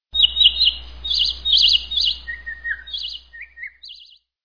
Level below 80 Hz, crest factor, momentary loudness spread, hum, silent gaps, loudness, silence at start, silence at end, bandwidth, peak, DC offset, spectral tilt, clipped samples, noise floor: -42 dBFS; 18 dB; 22 LU; none; none; -16 LUFS; 0.15 s; 0.4 s; 5.4 kHz; -2 dBFS; 0.5%; 0.5 dB/octave; under 0.1%; -48 dBFS